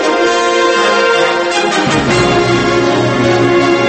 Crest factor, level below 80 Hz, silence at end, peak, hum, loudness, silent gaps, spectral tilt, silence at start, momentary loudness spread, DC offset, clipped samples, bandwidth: 10 dB; -38 dBFS; 0 s; 0 dBFS; none; -11 LUFS; none; -4.5 dB/octave; 0 s; 2 LU; under 0.1%; under 0.1%; 8.8 kHz